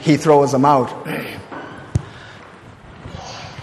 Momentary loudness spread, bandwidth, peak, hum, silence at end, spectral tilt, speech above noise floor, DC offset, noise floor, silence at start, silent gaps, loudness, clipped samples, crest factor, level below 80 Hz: 25 LU; 14.5 kHz; -2 dBFS; none; 0 s; -6.5 dB/octave; 25 dB; under 0.1%; -40 dBFS; 0 s; none; -17 LUFS; under 0.1%; 18 dB; -44 dBFS